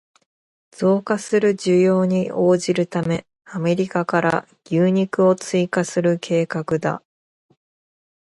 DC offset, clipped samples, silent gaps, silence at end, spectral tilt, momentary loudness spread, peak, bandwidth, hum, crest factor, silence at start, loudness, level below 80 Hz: under 0.1%; under 0.1%; none; 1.3 s; -6.5 dB/octave; 8 LU; -2 dBFS; 11.5 kHz; none; 18 dB; 0.8 s; -20 LUFS; -62 dBFS